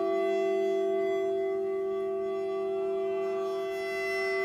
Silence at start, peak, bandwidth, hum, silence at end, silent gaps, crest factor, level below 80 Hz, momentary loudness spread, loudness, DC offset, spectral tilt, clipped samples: 0 s; -20 dBFS; 13.5 kHz; none; 0 s; none; 10 dB; -70 dBFS; 4 LU; -30 LUFS; under 0.1%; -5 dB/octave; under 0.1%